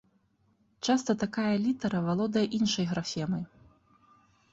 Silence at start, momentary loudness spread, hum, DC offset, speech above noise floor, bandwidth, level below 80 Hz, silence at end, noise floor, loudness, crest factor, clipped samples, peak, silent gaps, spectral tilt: 0.85 s; 7 LU; none; under 0.1%; 41 dB; 8 kHz; -64 dBFS; 1.05 s; -69 dBFS; -30 LUFS; 16 dB; under 0.1%; -14 dBFS; none; -5.5 dB/octave